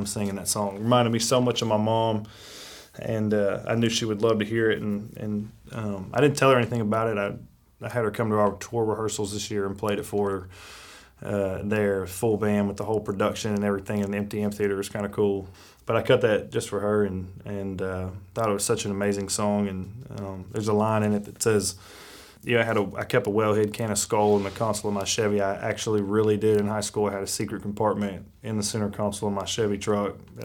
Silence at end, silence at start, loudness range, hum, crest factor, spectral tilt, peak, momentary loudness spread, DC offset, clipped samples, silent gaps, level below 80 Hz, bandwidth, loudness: 0 s; 0 s; 3 LU; none; 20 dB; -5 dB/octave; -6 dBFS; 12 LU; under 0.1%; under 0.1%; none; -56 dBFS; 18.5 kHz; -26 LUFS